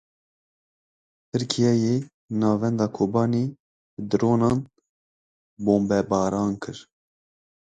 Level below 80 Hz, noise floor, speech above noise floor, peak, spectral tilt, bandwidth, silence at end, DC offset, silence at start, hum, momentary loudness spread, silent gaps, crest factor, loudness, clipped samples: -56 dBFS; under -90 dBFS; over 68 dB; -4 dBFS; -7 dB/octave; 9.2 kHz; 0.95 s; under 0.1%; 1.35 s; none; 11 LU; 2.14-2.28 s, 3.60-3.97 s, 4.89-5.57 s; 20 dB; -24 LUFS; under 0.1%